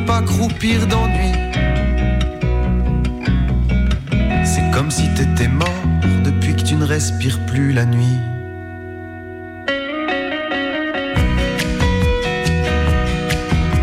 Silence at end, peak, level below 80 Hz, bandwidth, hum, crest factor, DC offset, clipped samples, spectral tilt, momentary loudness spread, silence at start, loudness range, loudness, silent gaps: 0 s; -6 dBFS; -22 dBFS; 15.5 kHz; none; 10 dB; under 0.1%; under 0.1%; -5.5 dB/octave; 5 LU; 0 s; 4 LU; -18 LUFS; none